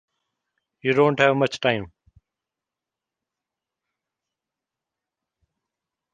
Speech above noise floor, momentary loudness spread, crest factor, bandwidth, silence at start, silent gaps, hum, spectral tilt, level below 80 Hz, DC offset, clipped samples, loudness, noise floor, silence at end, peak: 67 dB; 11 LU; 24 dB; 9.2 kHz; 0.85 s; none; none; -5.5 dB/octave; -62 dBFS; under 0.1%; under 0.1%; -21 LUFS; -88 dBFS; 4.25 s; -2 dBFS